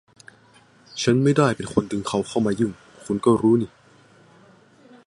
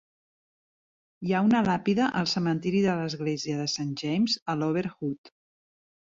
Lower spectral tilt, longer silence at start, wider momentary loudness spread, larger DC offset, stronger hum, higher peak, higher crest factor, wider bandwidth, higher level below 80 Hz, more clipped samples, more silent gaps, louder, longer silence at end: about the same, -6 dB/octave vs -5.5 dB/octave; second, 0.95 s vs 1.2 s; about the same, 11 LU vs 9 LU; neither; neither; first, -2 dBFS vs -12 dBFS; about the same, 20 dB vs 18 dB; first, 11.5 kHz vs 7.8 kHz; first, -56 dBFS vs -64 dBFS; neither; second, none vs 4.42-4.46 s, 5.18-5.24 s; first, -21 LUFS vs -27 LUFS; first, 1.4 s vs 0.75 s